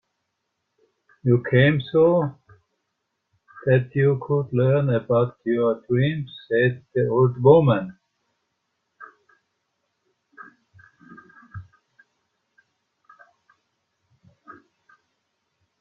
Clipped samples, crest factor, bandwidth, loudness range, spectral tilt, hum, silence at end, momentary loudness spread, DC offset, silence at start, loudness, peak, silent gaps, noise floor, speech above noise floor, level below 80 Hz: under 0.1%; 22 dB; 4.1 kHz; 3 LU; -10.5 dB/octave; none; 4.2 s; 14 LU; under 0.1%; 1.25 s; -21 LUFS; -2 dBFS; none; -78 dBFS; 58 dB; -60 dBFS